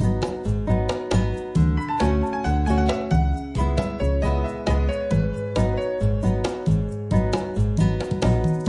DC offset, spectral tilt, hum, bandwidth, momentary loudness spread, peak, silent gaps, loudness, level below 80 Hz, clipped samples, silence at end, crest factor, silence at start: under 0.1%; -7.5 dB/octave; none; 11 kHz; 3 LU; -6 dBFS; none; -23 LUFS; -28 dBFS; under 0.1%; 0 s; 14 dB; 0 s